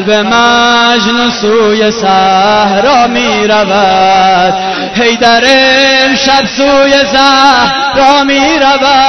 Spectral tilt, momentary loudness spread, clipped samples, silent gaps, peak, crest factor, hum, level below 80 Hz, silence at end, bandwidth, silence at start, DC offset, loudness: -3 dB/octave; 4 LU; 0.3%; none; 0 dBFS; 6 dB; none; -38 dBFS; 0 s; 11 kHz; 0 s; under 0.1%; -6 LUFS